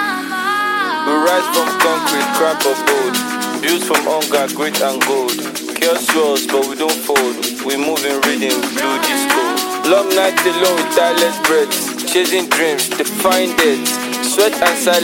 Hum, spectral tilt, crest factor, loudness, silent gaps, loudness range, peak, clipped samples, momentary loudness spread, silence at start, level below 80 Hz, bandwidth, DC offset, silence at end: none; -1.5 dB/octave; 16 dB; -15 LUFS; none; 2 LU; 0 dBFS; under 0.1%; 5 LU; 0 s; -60 dBFS; 17 kHz; under 0.1%; 0 s